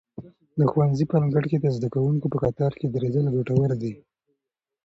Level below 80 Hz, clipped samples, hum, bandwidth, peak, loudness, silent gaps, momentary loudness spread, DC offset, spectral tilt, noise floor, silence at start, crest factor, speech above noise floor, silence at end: -54 dBFS; under 0.1%; none; 7.2 kHz; -8 dBFS; -24 LUFS; none; 9 LU; under 0.1%; -10 dB/octave; -84 dBFS; 0.2 s; 16 dB; 61 dB; 0.9 s